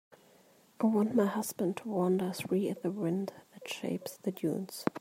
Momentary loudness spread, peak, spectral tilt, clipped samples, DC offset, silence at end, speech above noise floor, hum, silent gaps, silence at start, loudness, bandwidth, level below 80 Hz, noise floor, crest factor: 9 LU; -12 dBFS; -6 dB/octave; under 0.1%; under 0.1%; 0 s; 31 dB; none; none; 0.8 s; -33 LUFS; 16 kHz; -78 dBFS; -63 dBFS; 20 dB